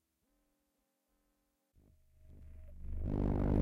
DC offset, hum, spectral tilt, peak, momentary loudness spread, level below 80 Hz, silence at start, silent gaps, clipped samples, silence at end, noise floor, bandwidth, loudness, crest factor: under 0.1%; none; -10.5 dB/octave; -22 dBFS; 24 LU; -44 dBFS; 2.3 s; none; under 0.1%; 0 s; -82 dBFS; 4.7 kHz; -38 LUFS; 16 dB